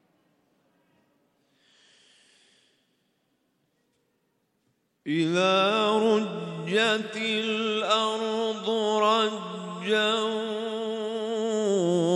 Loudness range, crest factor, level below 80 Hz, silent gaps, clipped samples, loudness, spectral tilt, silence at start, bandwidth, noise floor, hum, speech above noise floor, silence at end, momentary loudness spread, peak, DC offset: 4 LU; 18 dB; -82 dBFS; none; under 0.1%; -26 LUFS; -4.5 dB/octave; 5.05 s; 11.5 kHz; -73 dBFS; none; 49 dB; 0 s; 9 LU; -10 dBFS; under 0.1%